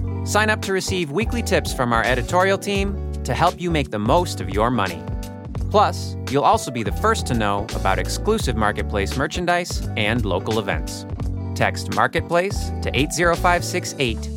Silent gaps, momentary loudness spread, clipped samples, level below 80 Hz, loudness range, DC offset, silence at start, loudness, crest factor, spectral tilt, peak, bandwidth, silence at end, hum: none; 7 LU; under 0.1%; -32 dBFS; 2 LU; under 0.1%; 0 s; -21 LUFS; 18 dB; -5 dB/octave; -2 dBFS; 17 kHz; 0 s; none